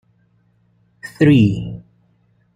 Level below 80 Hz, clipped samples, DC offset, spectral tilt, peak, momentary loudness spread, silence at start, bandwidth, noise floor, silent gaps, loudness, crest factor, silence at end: -46 dBFS; under 0.1%; under 0.1%; -8.5 dB/octave; -2 dBFS; 24 LU; 1.05 s; 10.5 kHz; -59 dBFS; none; -15 LUFS; 16 dB; 0.75 s